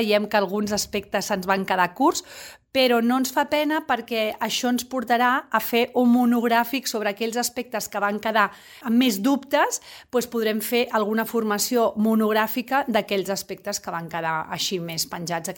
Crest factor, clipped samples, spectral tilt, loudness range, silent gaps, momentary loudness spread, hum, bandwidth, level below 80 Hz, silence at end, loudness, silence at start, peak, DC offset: 18 dB; under 0.1%; -3.5 dB/octave; 2 LU; none; 8 LU; none; 17 kHz; -62 dBFS; 0 s; -23 LUFS; 0 s; -4 dBFS; under 0.1%